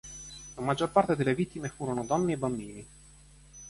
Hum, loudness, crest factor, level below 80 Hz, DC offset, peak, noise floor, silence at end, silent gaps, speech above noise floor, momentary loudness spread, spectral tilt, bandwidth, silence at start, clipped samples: none; -30 LUFS; 22 dB; -56 dBFS; under 0.1%; -10 dBFS; -55 dBFS; 0 s; none; 25 dB; 17 LU; -6 dB/octave; 11.5 kHz; 0.05 s; under 0.1%